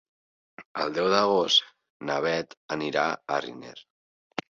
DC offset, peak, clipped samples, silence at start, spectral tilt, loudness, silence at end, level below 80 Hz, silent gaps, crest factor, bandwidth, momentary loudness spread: under 0.1%; -6 dBFS; under 0.1%; 0.6 s; -3.5 dB/octave; -26 LUFS; 0.7 s; -70 dBFS; 0.66-0.75 s, 1.90-2.00 s, 2.57-2.69 s; 22 dB; 7.6 kHz; 17 LU